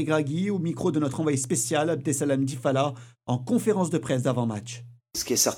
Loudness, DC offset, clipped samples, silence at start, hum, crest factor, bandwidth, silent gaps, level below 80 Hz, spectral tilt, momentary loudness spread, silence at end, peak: -26 LUFS; under 0.1%; under 0.1%; 0 s; none; 18 dB; 18.5 kHz; none; -64 dBFS; -5 dB/octave; 8 LU; 0 s; -8 dBFS